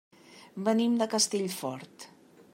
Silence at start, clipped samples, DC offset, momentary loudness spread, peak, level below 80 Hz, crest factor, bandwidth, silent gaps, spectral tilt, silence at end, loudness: 0.3 s; under 0.1%; under 0.1%; 22 LU; -12 dBFS; -84 dBFS; 18 dB; 16 kHz; none; -3.5 dB/octave; 0.45 s; -28 LUFS